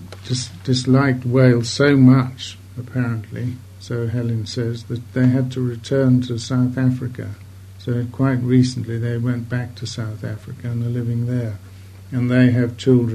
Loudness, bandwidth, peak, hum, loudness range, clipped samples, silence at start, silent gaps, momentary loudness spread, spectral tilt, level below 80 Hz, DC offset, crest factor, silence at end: -19 LUFS; 10 kHz; 0 dBFS; none; 6 LU; under 0.1%; 0 s; none; 14 LU; -7 dB/octave; -54 dBFS; under 0.1%; 18 dB; 0 s